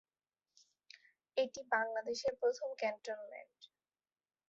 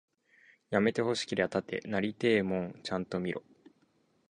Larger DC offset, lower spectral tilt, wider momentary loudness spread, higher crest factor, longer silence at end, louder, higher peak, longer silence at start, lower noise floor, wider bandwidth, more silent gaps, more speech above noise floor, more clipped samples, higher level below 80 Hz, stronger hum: neither; second, 0 dB/octave vs -5.5 dB/octave; first, 24 LU vs 8 LU; about the same, 22 dB vs 22 dB; about the same, 0.85 s vs 0.9 s; second, -39 LUFS vs -32 LUFS; second, -20 dBFS vs -12 dBFS; first, 1.35 s vs 0.7 s; first, under -90 dBFS vs -71 dBFS; second, 7.6 kHz vs 10.5 kHz; neither; first, over 51 dB vs 40 dB; neither; second, -82 dBFS vs -66 dBFS; neither